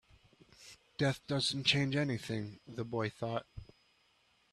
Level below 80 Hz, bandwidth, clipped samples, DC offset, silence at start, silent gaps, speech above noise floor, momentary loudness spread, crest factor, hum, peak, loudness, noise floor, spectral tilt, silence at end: -64 dBFS; 12.5 kHz; under 0.1%; under 0.1%; 0.6 s; none; 37 dB; 24 LU; 24 dB; none; -14 dBFS; -35 LUFS; -72 dBFS; -5 dB/octave; 0.9 s